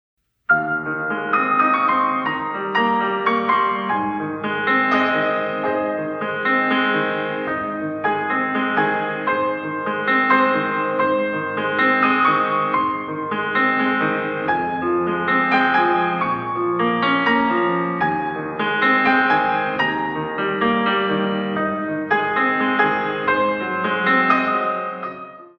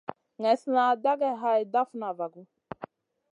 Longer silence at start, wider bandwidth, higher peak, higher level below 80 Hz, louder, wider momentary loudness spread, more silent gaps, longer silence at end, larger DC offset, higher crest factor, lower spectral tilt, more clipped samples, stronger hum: about the same, 0.5 s vs 0.4 s; second, 6.2 kHz vs 10.5 kHz; first, -2 dBFS vs -10 dBFS; first, -60 dBFS vs -76 dBFS; first, -19 LUFS vs -27 LUFS; second, 8 LU vs 19 LU; neither; second, 0.1 s vs 0.45 s; neither; about the same, 18 dB vs 18 dB; first, -7 dB/octave vs -5.5 dB/octave; neither; neither